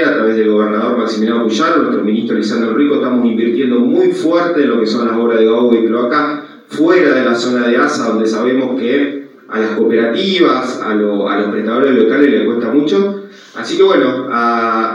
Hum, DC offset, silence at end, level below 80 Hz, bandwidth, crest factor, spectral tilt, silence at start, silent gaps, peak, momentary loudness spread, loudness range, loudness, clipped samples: none; under 0.1%; 0 s; -72 dBFS; 10.5 kHz; 12 dB; -5.5 dB/octave; 0 s; none; 0 dBFS; 5 LU; 2 LU; -13 LUFS; under 0.1%